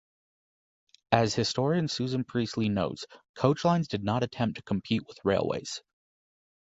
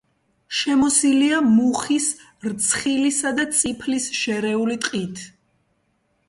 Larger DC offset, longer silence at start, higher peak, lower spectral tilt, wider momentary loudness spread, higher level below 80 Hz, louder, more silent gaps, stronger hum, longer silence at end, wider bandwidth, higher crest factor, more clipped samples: neither; first, 1.1 s vs 0.5 s; about the same, -4 dBFS vs -4 dBFS; first, -5.5 dB/octave vs -2.5 dB/octave; second, 8 LU vs 11 LU; about the same, -58 dBFS vs -58 dBFS; second, -29 LUFS vs -20 LUFS; first, 3.29-3.34 s vs none; neither; about the same, 0.95 s vs 1 s; second, 8 kHz vs 11.5 kHz; first, 26 dB vs 16 dB; neither